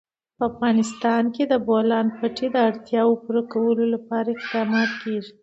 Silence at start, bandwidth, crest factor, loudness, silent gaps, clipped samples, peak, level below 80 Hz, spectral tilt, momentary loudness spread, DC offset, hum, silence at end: 0.4 s; 8 kHz; 14 dB; -22 LUFS; none; under 0.1%; -6 dBFS; -64 dBFS; -5.5 dB/octave; 6 LU; under 0.1%; none; 0.1 s